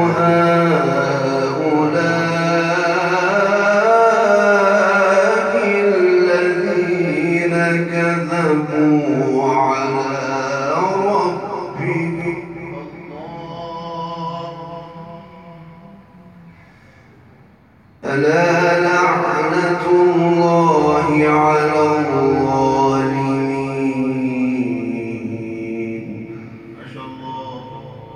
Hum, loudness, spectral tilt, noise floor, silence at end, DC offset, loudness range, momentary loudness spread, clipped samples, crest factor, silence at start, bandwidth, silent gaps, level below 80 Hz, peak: none; -16 LUFS; -6.5 dB/octave; -48 dBFS; 0 s; under 0.1%; 15 LU; 18 LU; under 0.1%; 16 dB; 0 s; 10 kHz; none; -56 dBFS; -2 dBFS